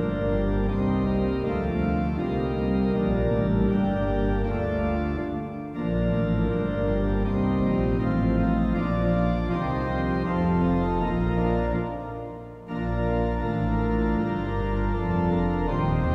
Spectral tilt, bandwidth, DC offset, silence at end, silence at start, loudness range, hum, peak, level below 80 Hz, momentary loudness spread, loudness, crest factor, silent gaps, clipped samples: -10 dB/octave; 5.8 kHz; under 0.1%; 0 s; 0 s; 2 LU; none; -12 dBFS; -32 dBFS; 5 LU; -25 LUFS; 12 dB; none; under 0.1%